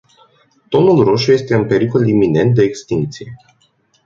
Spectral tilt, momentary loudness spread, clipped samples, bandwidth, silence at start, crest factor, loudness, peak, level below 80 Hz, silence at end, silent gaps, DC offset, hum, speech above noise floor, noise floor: -7 dB/octave; 10 LU; under 0.1%; 7.6 kHz; 0.7 s; 14 dB; -14 LUFS; 0 dBFS; -48 dBFS; 0.7 s; none; under 0.1%; none; 45 dB; -58 dBFS